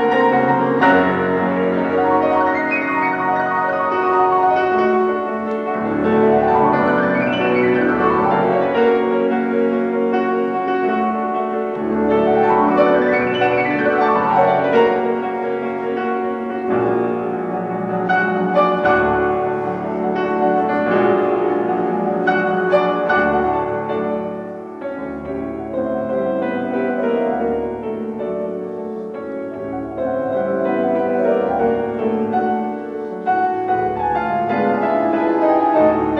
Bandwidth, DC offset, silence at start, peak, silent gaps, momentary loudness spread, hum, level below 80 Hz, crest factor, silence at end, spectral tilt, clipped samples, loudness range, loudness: 6.4 kHz; under 0.1%; 0 s; -2 dBFS; none; 9 LU; none; -50 dBFS; 16 dB; 0 s; -8 dB/octave; under 0.1%; 6 LU; -18 LUFS